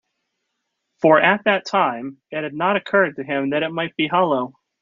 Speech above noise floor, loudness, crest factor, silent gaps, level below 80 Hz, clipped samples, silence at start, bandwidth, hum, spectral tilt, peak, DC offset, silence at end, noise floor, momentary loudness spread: 57 dB; -19 LUFS; 20 dB; none; -68 dBFS; under 0.1%; 1.05 s; 7.4 kHz; none; -3 dB/octave; -2 dBFS; under 0.1%; 0.3 s; -76 dBFS; 13 LU